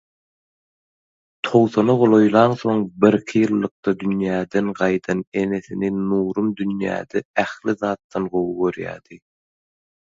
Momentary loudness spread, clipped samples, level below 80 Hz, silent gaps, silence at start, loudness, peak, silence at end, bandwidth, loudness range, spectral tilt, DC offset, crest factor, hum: 9 LU; under 0.1%; -58 dBFS; 3.71-3.83 s, 5.27-5.32 s, 7.25-7.34 s, 8.04-8.10 s; 1.45 s; -20 LUFS; 0 dBFS; 1 s; 7.8 kHz; 6 LU; -7.5 dB/octave; under 0.1%; 20 dB; none